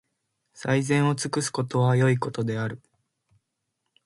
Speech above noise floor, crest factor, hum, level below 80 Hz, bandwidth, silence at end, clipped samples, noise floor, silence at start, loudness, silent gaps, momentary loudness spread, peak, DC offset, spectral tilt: 56 dB; 16 dB; none; -66 dBFS; 11.5 kHz; 1.3 s; under 0.1%; -80 dBFS; 0.55 s; -25 LUFS; none; 11 LU; -10 dBFS; under 0.1%; -6 dB/octave